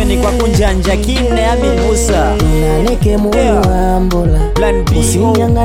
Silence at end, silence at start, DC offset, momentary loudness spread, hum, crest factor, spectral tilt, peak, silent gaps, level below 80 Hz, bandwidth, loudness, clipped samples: 0 s; 0 s; under 0.1%; 2 LU; none; 10 dB; -5.5 dB/octave; 0 dBFS; none; -16 dBFS; 16 kHz; -12 LUFS; under 0.1%